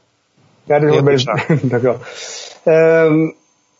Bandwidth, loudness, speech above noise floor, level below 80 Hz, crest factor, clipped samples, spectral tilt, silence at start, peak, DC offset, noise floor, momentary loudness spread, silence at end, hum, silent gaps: 7.8 kHz; -14 LUFS; 43 dB; -60 dBFS; 14 dB; under 0.1%; -6.5 dB/octave; 0.7 s; 0 dBFS; under 0.1%; -56 dBFS; 14 LU; 0.5 s; none; none